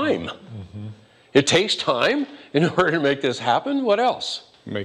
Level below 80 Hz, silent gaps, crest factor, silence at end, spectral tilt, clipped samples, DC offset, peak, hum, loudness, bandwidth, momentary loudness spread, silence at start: -58 dBFS; none; 20 dB; 0 s; -4.5 dB/octave; under 0.1%; under 0.1%; -2 dBFS; none; -21 LUFS; 11.5 kHz; 18 LU; 0 s